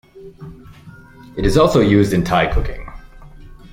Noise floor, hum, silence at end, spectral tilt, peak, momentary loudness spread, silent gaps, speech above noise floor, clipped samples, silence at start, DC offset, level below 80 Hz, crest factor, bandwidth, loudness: -38 dBFS; none; 0.2 s; -6.5 dB/octave; -2 dBFS; 25 LU; none; 22 dB; under 0.1%; 0.15 s; under 0.1%; -28 dBFS; 18 dB; 16.5 kHz; -15 LUFS